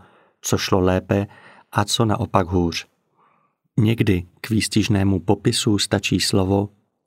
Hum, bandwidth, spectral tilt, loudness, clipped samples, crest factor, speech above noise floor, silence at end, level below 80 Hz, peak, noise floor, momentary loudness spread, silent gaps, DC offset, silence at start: none; 16 kHz; -5 dB/octave; -20 LUFS; under 0.1%; 20 dB; 44 dB; 0.4 s; -48 dBFS; 0 dBFS; -64 dBFS; 6 LU; none; under 0.1%; 0.45 s